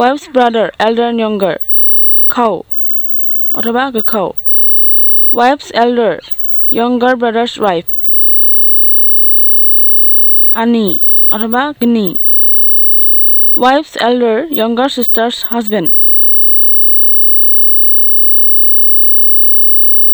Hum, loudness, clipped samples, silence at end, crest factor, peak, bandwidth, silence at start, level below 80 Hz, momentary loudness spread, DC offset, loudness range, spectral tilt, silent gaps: none; -5 LUFS; 0.1%; 0 s; 8 dB; 0 dBFS; over 20 kHz; 0 s; -50 dBFS; 9 LU; under 0.1%; 5 LU; -5 dB/octave; none